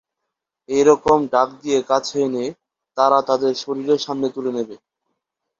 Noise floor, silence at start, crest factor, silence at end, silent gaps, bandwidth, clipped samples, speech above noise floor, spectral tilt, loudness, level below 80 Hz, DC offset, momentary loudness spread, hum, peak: -81 dBFS; 0.7 s; 18 dB; 0.85 s; none; 7.6 kHz; under 0.1%; 62 dB; -4.5 dB/octave; -19 LUFS; -58 dBFS; under 0.1%; 11 LU; none; -2 dBFS